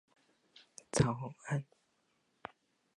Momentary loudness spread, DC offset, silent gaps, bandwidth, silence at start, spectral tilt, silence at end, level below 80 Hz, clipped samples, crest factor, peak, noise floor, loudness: 23 LU; under 0.1%; none; 11.5 kHz; 0.95 s; -5.5 dB/octave; 1.35 s; -60 dBFS; under 0.1%; 26 dB; -14 dBFS; -77 dBFS; -36 LUFS